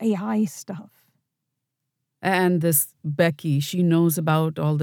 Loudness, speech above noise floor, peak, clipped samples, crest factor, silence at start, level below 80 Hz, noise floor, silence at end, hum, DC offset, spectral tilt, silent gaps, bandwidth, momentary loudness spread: -22 LUFS; 59 dB; -4 dBFS; under 0.1%; 18 dB; 0 s; -76 dBFS; -81 dBFS; 0 s; none; under 0.1%; -5.5 dB/octave; none; 20 kHz; 9 LU